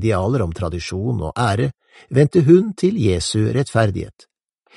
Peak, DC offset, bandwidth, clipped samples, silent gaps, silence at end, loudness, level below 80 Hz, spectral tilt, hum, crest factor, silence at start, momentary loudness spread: 0 dBFS; under 0.1%; 11.5 kHz; under 0.1%; none; 0.65 s; -18 LUFS; -40 dBFS; -6.5 dB/octave; none; 18 dB; 0 s; 11 LU